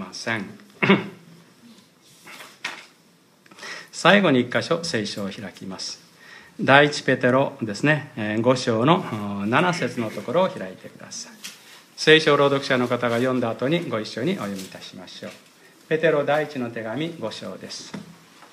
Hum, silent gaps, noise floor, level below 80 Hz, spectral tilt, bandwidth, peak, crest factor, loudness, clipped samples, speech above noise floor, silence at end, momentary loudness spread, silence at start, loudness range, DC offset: none; none; -56 dBFS; -70 dBFS; -5 dB/octave; 15.5 kHz; 0 dBFS; 24 dB; -21 LUFS; under 0.1%; 34 dB; 0.05 s; 22 LU; 0 s; 6 LU; under 0.1%